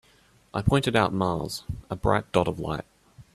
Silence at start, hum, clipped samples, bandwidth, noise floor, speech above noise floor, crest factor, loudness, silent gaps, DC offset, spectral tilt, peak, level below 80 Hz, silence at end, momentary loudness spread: 0.55 s; none; under 0.1%; 14 kHz; -60 dBFS; 34 dB; 22 dB; -26 LUFS; none; under 0.1%; -6 dB/octave; -4 dBFS; -44 dBFS; 0.1 s; 12 LU